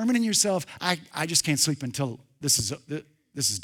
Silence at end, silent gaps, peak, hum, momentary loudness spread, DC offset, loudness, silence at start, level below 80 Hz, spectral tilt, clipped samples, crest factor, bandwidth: 0 s; none; -4 dBFS; none; 13 LU; under 0.1%; -25 LUFS; 0 s; -60 dBFS; -3 dB/octave; under 0.1%; 22 dB; 19.5 kHz